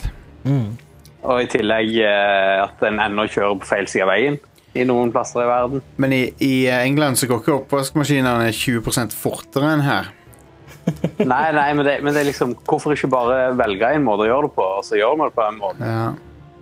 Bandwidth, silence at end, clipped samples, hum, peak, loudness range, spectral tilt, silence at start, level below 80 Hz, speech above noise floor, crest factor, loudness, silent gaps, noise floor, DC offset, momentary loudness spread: 16 kHz; 0.2 s; under 0.1%; none; -2 dBFS; 2 LU; -5 dB/octave; 0 s; -44 dBFS; 27 dB; 18 dB; -18 LUFS; none; -45 dBFS; under 0.1%; 7 LU